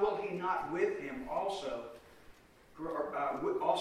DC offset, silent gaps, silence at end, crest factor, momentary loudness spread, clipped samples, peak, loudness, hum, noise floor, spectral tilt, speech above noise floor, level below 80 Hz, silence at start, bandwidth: under 0.1%; none; 0 s; 18 dB; 11 LU; under 0.1%; -18 dBFS; -36 LUFS; none; -59 dBFS; -5.5 dB/octave; 23 dB; -64 dBFS; 0 s; 13.5 kHz